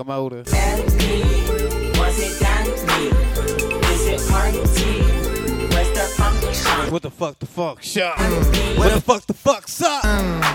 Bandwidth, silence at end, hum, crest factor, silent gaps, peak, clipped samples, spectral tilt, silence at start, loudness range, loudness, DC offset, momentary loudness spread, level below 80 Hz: 17.5 kHz; 0 s; none; 18 dB; none; 0 dBFS; under 0.1%; -4.5 dB/octave; 0 s; 1 LU; -19 LUFS; under 0.1%; 5 LU; -22 dBFS